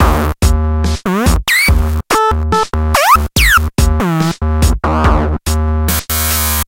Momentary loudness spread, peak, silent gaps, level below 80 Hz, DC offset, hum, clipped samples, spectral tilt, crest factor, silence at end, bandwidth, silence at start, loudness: 6 LU; 0 dBFS; none; -16 dBFS; under 0.1%; none; under 0.1%; -4.5 dB/octave; 12 dB; 0.05 s; 17.5 kHz; 0 s; -12 LUFS